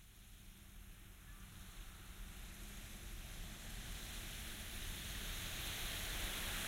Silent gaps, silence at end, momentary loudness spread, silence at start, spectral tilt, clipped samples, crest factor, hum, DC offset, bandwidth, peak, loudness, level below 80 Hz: none; 0 s; 16 LU; 0 s; -2 dB/octave; under 0.1%; 18 dB; none; under 0.1%; 16 kHz; -30 dBFS; -47 LUFS; -52 dBFS